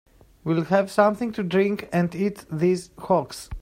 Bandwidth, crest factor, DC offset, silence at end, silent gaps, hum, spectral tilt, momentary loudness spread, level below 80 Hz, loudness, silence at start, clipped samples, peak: 16 kHz; 20 dB; under 0.1%; 0 s; none; none; -7 dB/octave; 7 LU; -48 dBFS; -23 LUFS; 0.45 s; under 0.1%; -4 dBFS